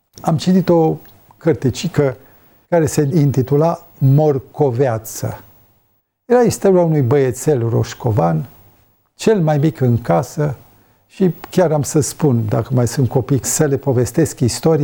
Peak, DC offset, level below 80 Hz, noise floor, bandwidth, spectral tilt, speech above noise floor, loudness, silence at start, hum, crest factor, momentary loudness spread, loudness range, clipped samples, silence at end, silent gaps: -2 dBFS; under 0.1%; -48 dBFS; -63 dBFS; 18.5 kHz; -6.5 dB/octave; 48 dB; -16 LUFS; 0.15 s; none; 14 dB; 8 LU; 1 LU; under 0.1%; 0 s; none